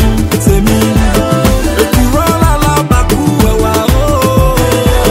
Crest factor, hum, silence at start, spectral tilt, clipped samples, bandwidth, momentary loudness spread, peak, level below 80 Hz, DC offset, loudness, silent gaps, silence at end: 8 dB; none; 0 s; -5.5 dB/octave; 0.5%; 16.5 kHz; 1 LU; 0 dBFS; -14 dBFS; under 0.1%; -10 LUFS; none; 0 s